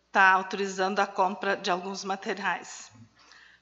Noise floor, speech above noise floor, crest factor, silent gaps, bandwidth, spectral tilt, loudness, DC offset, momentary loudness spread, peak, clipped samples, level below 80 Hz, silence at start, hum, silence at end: -56 dBFS; 29 dB; 22 dB; none; 8.2 kHz; -3 dB/octave; -27 LUFS; under 0.1%; 13 LU; -6 dBFS; under 0.1%; -78 dBFS; 0.15 s; none; 0.55 s